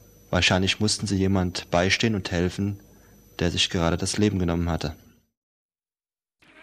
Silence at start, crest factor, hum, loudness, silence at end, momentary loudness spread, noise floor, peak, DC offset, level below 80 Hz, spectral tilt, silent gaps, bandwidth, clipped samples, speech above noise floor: 0.3 s; 20 dB; none; -24 LUFS; 1.65 s; 9 LU; under -90 dBFS; -6 dBFS; under 0.1%; -44 dBFS; -4.5 dB/octave; none; 12.5 kHz; under 0.1%; over 66 dB